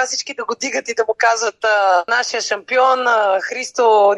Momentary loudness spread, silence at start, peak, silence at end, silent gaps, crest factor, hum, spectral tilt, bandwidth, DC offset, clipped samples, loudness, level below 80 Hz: 7 LU; 0 s; -2 dBFS; 0 s; none; 14 dB; none; 0 dB/octave; 11.5 kHz; under 0.1%; under 0.1%; -16 LUFS; -72 dBFS